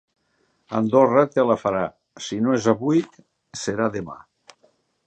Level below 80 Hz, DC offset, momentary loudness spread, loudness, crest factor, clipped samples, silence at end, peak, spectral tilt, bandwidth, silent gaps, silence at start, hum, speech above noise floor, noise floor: -60 dBFS; under 0.1%; 19 LU; -21 LUFS; 20 dB; under 0.1%; 0.9 s; -2 dBFS; -6 dB/octave; 8.8 kHz; none; 0.7 s; none; 47 dB; -67 dBFS